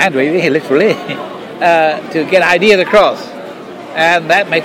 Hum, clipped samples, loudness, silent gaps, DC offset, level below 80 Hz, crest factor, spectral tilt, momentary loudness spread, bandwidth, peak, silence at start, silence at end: none; under 0.1%; -11 LUFS; none; under 0.1%; -50 dBFS; 12 dB; -4.5 dB/octave; 17 LU; 16.5 kHz; 0 dBFS; 0 s; 0 s